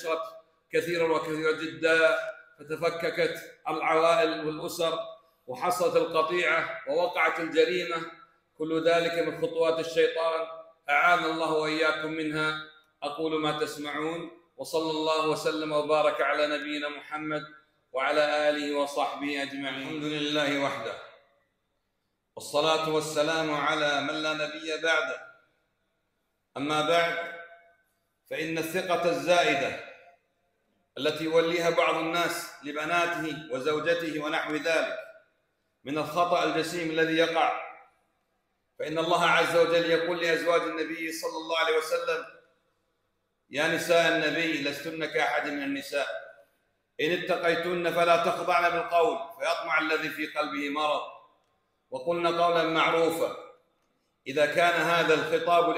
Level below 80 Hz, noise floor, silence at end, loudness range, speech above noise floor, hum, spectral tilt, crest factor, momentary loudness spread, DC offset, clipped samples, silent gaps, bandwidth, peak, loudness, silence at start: -72 dBFS; -78 dBFS; 0 s; 4 LU; 51 dB; none; -4 dB/octave; 18 dB; 12 LU; under 0.1%; under 0.1%; none; 16 kHz; -10 dBFS; -27 LUFS; 0 s